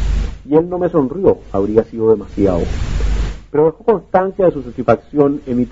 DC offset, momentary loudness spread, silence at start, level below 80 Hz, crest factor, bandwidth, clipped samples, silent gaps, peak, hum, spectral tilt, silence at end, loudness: under 0.1%; 7 LU; 0 s; -24 dBFS; 16 dB; 7.8 kHz; under 0.1%; none; 0 dBFS; none; -8.5 dB/octave; 0 s; -16 LUFS